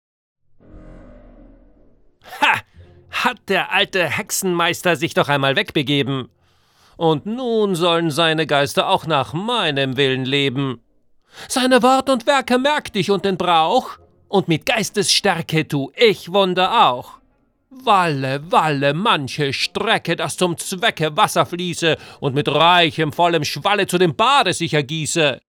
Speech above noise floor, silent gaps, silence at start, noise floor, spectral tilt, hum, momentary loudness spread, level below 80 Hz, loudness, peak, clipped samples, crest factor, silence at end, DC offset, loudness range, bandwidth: 43 dB; none; 0.7 s; -60 dBFS; -4 dB/octave; none; 7 LU; -56 dBFS; -18 LUFS; -2 dBFS; under 0.1%; 18 dB; 0.2 s; under 0.1%; 3 LU; over 20 kHz